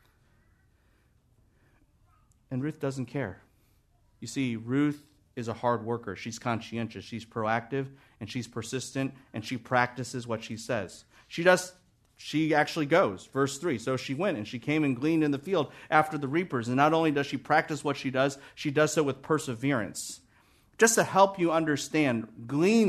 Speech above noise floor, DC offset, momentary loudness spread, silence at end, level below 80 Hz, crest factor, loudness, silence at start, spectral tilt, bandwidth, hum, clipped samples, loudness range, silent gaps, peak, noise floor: 38 dB; under 0.1%; 14 LU; 0 s; -68 dBFS; 22 dB; -29 LUFS; 2.5 s; -5 dB/octave; 13.5 kHz; none; under 0.1%; 8 LU; none; -6 dBFS; -66 dBFS